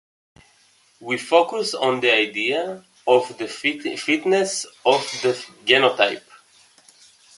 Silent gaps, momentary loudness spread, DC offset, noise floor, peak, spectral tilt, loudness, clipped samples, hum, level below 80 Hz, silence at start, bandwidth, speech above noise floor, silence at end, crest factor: none; 10 LU; under 0.1%; -58 dBFS; 0 dBFS; -2.5 dB/octave; -20 LUFS; under 0.1%; none; -72 dBFS; 1 s; 11.5 kHz; 37 dB; 1.2 s; 22 dB